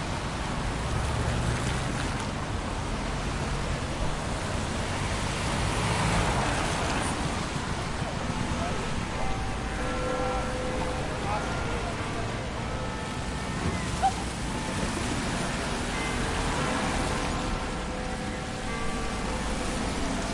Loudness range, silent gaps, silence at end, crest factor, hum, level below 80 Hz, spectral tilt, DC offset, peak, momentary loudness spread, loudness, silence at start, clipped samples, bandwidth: 3 LU; none; 0 s; 16 dB; none; -36 dBFS; -4.5 dB/octave; under 0.1%; -12 dBFS; 5 LU; -30 LUFS; 0 s; under 0.1%; 11.5 kHz